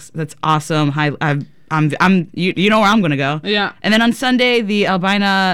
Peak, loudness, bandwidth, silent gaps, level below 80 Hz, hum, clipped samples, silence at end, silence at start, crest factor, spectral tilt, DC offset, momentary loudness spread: -2 dBFS; -15 LUFS; 15.5 kHz; none; -50 dBFS; none; under 0.1%; 0 s; 0 s; 14 dB; -5.5 dB/octave; 0.6%; 7 LU